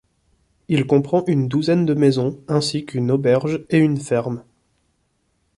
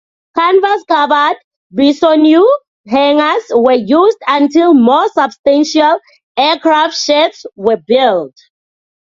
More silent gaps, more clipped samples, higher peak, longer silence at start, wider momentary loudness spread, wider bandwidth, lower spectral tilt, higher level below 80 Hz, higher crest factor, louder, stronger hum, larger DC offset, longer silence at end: second, none vs 1.44-1.70 s, 2.68-2.84 s, 5.39-5.44 s, 6.23-6.35 s; neither; second, -4 dBFS vs 0 dBFS; first, 0.7 s vs 0.35 s; second, 6 LU vs 9 LU; first, 11.5 kHz vs 7.6 kHz; first, -7 dB/octave vs -4 dB/octave; about the same, -56 dBFS vs -56 dBFS; first, 16 dB vs 10 dB; second, -19 LUFS vs -11 LUFS; neither; neither; first, 1.15 s vs 0.8 s